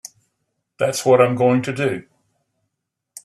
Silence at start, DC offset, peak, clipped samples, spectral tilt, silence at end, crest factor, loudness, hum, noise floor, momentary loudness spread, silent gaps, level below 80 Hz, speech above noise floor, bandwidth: 0.8 s; under 0.1%; -2 dBFS; under 0.1%; -5.5 dB/octave; 1.25 s; 20 dB; -18 LUFS; none; -79 dBFS; 9 LU; none; -64 dBFS; 62 dB; 13.5 kHz